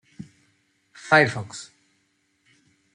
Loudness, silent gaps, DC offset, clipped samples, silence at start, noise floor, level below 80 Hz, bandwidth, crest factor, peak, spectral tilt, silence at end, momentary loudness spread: -20 LUFS; none; under 0.1%; under 0.1%; 0.2 s; -69 dBFS; -68 dBFS; 11 kHz; 24 dB; -4 dBFS; -4.5 dB/octave; 1.3 s; 27 LU